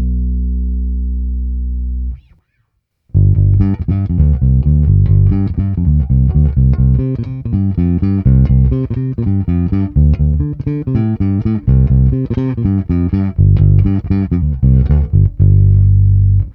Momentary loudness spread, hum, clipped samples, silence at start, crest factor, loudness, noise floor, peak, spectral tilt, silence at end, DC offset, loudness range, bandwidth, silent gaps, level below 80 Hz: 9 LU; none; under 0.1%; 0 s; 12 dB; -13 LUFS; -64 dBFS; 0 dBFS; -13 dB/octave; 0 s; under 0.1%; 4 LU; 2.9 kHz; none; -18 dBFS